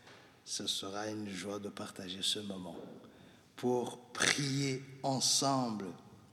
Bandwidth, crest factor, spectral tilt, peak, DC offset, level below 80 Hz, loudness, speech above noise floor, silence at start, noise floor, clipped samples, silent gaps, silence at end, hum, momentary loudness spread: 16 kHz; 28 dB; -3 dB/octave; -10 dBFS; under 0.1%; -76 dBFS; -35 LUFS; 20 dB; 0.05 s; -56 dBFS; under 0.1%; none; 0.05 s; none; 19 LU